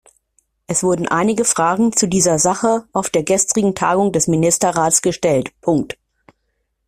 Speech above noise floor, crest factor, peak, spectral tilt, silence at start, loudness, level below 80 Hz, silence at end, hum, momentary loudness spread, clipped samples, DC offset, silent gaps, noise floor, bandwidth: 54 dB; 16 dB; 0 dBFS; -4 dB/octave; 0.7 s; -16 LUFS; -50 dBFS; 0.95 s; none; 5 LU; under 0.1%; under 0.1%; none; -70 dBFS; 16 kHz